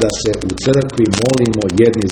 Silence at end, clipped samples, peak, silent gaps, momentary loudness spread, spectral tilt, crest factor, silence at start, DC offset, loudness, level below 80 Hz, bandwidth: 0 s; under 0.1%; 0 dBFS; none; 5 LU; -5.5 dB/octave; 14 dB; 0 s; under 0.1%; -15 LUFS; -36 dBFS; 10.5 kHz